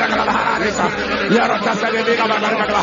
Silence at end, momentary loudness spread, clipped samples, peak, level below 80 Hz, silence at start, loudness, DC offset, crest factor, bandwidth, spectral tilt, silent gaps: 0 s; 3 LU; under 0.1%; -2 dBFS; -44 dBFS; 0 s; -16 LUFS; under 0.1%; 16 dB; 7.6 kHz; -4 dB/octave; none